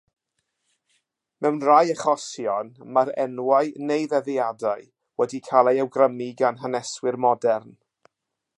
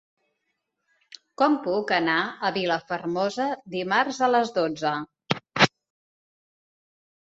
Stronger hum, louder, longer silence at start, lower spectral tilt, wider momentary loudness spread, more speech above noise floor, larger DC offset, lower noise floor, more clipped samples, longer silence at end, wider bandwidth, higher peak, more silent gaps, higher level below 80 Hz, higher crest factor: neither; about the same, -23 LUFS vs -25 LUFS; about the same, 1.4 s vs 1.4 s; about the same, -5 dB/octave vs -4.5 dB/octave; about the same, 10 LU vs 8 LU; first, 58 dB vs 54 dB; neither; about the same, -80 dBFS vs -78 dBFS; neither; second, 0.9 s vs 1.7 s; first, 11.5 kHz vs 8 kHz; about the same, -2 dBFS vs -2 dBFS; neither; second, -78 dBFS vs -70 dBFS; about the same, 22 dB vs 26 dB